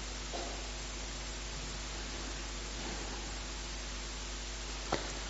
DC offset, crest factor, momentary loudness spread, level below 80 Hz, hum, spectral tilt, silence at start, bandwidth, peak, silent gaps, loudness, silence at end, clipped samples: under 0.1%; 24 dB; 3 LU; -44 dBFS; none; -2.5 dB/octave; 0 s; 8 kHz; -16 dBFS; none; -41 LUFS; 0 s; under 0.1%